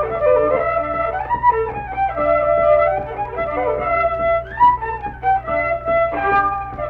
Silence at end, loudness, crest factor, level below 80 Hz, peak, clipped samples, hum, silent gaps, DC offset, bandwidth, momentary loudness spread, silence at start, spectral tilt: 0 s; -18 LUFS; 14 dB; -38 dBFS; -4 dBFS; under 0.1%; none; none; under 0.1%; 5 kHz; 7 LU; 0 s; -8.5 dB/octave